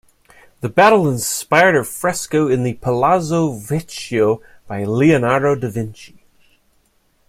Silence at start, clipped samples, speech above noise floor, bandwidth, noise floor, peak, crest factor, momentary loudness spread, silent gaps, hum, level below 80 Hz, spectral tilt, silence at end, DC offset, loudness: 0.6 s; under 0.1%; 43 dB; 16.5 kHz; -60 dBFS; 0 dBFS; 18 dB; 12 LU; none; none; -52 dBFS; -5.5 dB/octave; 1.25 s; under 0.1%; -16 LUFS